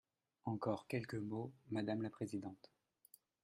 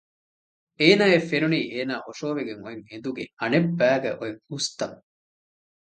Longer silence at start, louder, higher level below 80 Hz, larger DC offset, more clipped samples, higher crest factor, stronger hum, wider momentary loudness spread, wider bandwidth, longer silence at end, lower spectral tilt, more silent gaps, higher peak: second, 0.45 s vs 0.8 s; second, -45 LUFS vs -24 LUFS; second, -80 dBFS vs -68 dBFS; neither; neither; about the same, 20 dB vs 22 dB; neither; second, 8 LU vs 15 LU; first, 13 kHz vs 9.2 kHz; about the same, 0.9 s vs 0.9 s; first, -7.5 dB/octave vs -5 dB/octave; second, none vs 3.33-3.37 s; second, -26 dBFS vs -2 dBFS